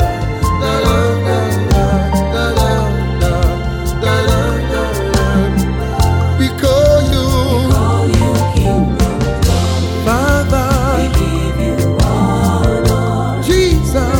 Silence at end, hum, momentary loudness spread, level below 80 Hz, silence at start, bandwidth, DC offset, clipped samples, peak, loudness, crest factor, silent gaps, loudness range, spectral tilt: 0 s; none; 4 LU; -18 dBFS; 0 s; 19 kHz; under 0.1%; under 0.1%; 0 dBFS; -14 LUFS; 12 dB; none; 2 LU; -6 dB/octave